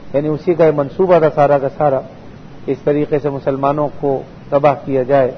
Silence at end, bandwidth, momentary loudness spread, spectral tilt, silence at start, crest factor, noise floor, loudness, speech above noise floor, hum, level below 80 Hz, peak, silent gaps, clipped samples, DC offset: 0 s; 6.4 kHz; 8 LU; -9.5 dB/octave; 0 s; 14 dB; -34 dBFS; -15 LUFS; 20 dB; none; -46 dBFS; 0 dBFS; none; under 0.1%; under 0.1%